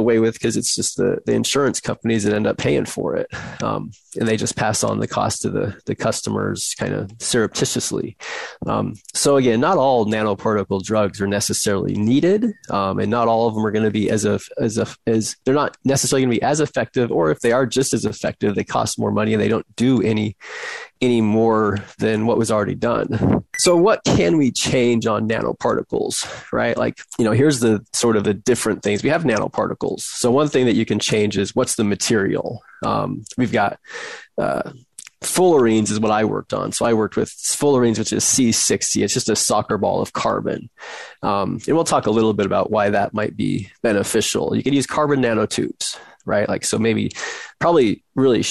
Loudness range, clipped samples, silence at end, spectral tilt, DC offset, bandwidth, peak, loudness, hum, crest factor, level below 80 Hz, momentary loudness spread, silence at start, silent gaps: 4 LU; under 0.1%; 0 s; -4.5 dB/octave; under 0.1%; 12.5 kHz; -4 dBFS; -19 LUFS; none; 14 dB; -48 dBFS; 8 LU; 0 s; none